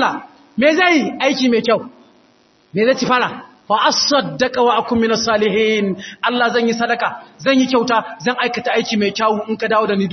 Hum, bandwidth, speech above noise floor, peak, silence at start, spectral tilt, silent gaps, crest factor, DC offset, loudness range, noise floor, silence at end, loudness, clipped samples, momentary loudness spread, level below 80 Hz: none; 6.4 kHz; 38 dB; 0 dBFS; 0 s; -4 dB/octave; none; 16 dB; under 0.1%; 2 LU; -54 dBFS; 0 s; -16 LUFS; under 0.1%; 7 LU; -58 dBFS